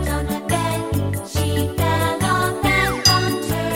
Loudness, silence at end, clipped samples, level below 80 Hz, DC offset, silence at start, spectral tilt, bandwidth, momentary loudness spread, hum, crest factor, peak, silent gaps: -19 LUFS; 0 s; under 0.1%; -34 dBFS; under 0.1%; 0 s; -4 dB/octave; 17 kHz; 8 LU; none; 18 dB; -2 dBFS; none